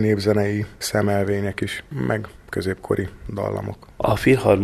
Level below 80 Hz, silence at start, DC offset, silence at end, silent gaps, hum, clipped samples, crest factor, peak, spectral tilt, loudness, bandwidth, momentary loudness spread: -44 dBFS; 0 s; under 0.1%; 0 s; none; none; under 0.1%; 20 dB; -2 dBFS; -6 dB/octave; -23 LUFS; 13.5 kHz; 10 LU